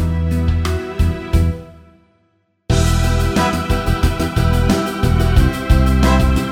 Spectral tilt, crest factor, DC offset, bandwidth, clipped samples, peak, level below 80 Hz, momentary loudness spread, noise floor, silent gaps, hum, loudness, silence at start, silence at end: -6 dB/octave; 14 dB; under 0.1%; 16.5 kHz; under 0.1%; 0 dBFS; -18 dBFS; 6 LU; -62 dBFS; none; none; -16 LUFS; 0 s; 0 s